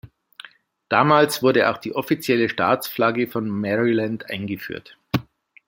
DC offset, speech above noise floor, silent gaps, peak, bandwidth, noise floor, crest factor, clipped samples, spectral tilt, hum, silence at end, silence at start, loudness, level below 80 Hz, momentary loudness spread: under 0.1%; 25 dB; none; -2 dBFS; 17 kHz; -46 dBFS; 20 dB; under 0.1%; -5.5 dB/octave; none; 0.45 s; 0.05 s; -21 LUFS; -60 dBFS; 12 LU